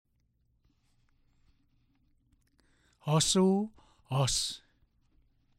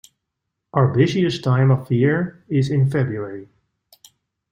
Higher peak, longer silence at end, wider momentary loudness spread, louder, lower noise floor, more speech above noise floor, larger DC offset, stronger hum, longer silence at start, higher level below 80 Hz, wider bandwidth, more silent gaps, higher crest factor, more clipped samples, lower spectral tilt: second, -14 dBFS vs -2 dBFS; about the same, 1 s vs 1.05 s; first, 16 LU vs 9 LU; second, -29 LUFS vs -19 LUFS; second, -73 dBFS vs -79 dBFS; second, 45 dB vs 61 dB; neither; neither; first, 3.05 s vs 0.75 s; about the same, -58 dBFS vs -56 dBFS; first, 16 kHz vs 7.8 kHz; neither; about the same, 20 dB vs 18 dB; neither; second, -4.5 dB/octave vs -8 dB/octave